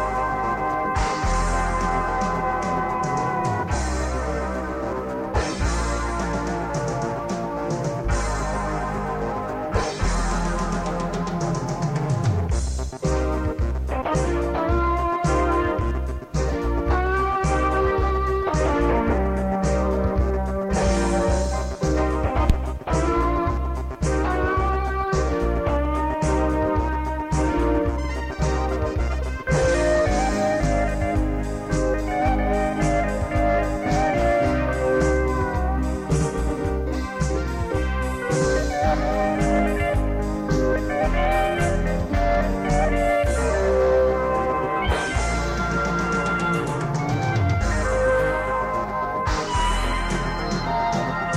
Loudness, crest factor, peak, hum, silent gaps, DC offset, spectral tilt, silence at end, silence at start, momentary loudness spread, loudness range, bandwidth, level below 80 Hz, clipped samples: -23 LUFS; 18 dB; -4 dBFS; none; none; under 0.1%; -6 dB/octave; 0 s; 0 s; 5 LU; 4 LU; 12 kHz; -28 dBFS; under 0.1%